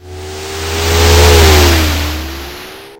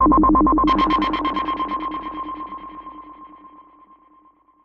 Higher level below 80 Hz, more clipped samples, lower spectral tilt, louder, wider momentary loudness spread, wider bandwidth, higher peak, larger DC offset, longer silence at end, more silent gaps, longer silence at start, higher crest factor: first, -16 dBFS vs -34 dBFS; first, 1% vs under 0.1%; second, -4 dB/octave vs -7.5 dB/octave; first, -9 LUFS vs -19 LUFS; second, 20 LU vs 23 LU; first, 17 kHz vs 6.2 kHz; first, 0 dBFS vs -6 dBFS; neither; second, 0.05 s vs 1.05 s; neither; about the same, 0.05 s vs 0 s; second, 10 dB vs 16 dB